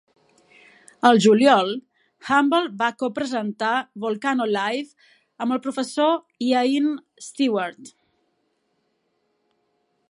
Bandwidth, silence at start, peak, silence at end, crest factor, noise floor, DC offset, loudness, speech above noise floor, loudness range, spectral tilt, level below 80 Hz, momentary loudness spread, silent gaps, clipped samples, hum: 11.5 kHz; 1.05 s; -2 dBFS; 2.2 s; 20 dB; -71 dBFS; under 0.1%; -21 LUFS; 50 dB; 6 LU; -4.5 dB/octave; -72 dBFS; 14 LU; none; under 0.1%; none